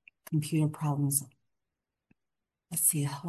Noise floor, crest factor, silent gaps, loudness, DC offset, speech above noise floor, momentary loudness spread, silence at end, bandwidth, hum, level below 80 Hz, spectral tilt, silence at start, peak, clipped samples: -87 dBFS; 24 dB; none; -29 LUFS; under 0.1%; 57 dB; 8 LU; 0 s; 13 kHz; none; -76 dBFS; -5 dB/octave; 0.3 s; -8 dBFS; under 0.1%